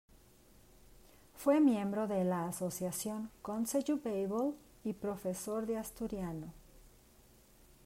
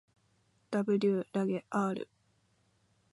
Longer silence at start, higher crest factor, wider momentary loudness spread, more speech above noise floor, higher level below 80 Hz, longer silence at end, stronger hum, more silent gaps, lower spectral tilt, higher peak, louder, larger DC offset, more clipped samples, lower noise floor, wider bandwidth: first, 1.35 s vs 0.7 s; about the same, 18 dB vs 16 dB; first, 13 LU vs 9 LU; second, 28 dB vs 41 dB; first, -64 dBFS vs -80 dBFS; about the same, 1.05 s vs 1.1 s; neither; neither; second, -6 dB/octave vs -7.5 dB/octave; about the same, -20 dBFS vs -20 dBFS; second, -36 LUFS vs -33 LUFS; neither; neither; second, -63 dBFS vs -72 dBFS; first, 16 kHz vs 11.5 kHz